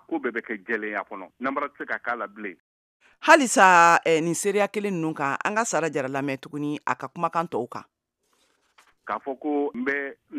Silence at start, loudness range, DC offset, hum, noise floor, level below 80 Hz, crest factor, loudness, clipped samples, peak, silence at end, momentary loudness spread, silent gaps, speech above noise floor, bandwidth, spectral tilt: 0.1 s; 11 LU; under 0.1%; none; -70 dBFS; -76 dBFS; 24 dB; -23 LUFS; under 0.1%; 0 dBFS; 0 s; 16 LU; 2.60-3.00 s; 46 dB; 15.5 kHz; -3.5 dB/octave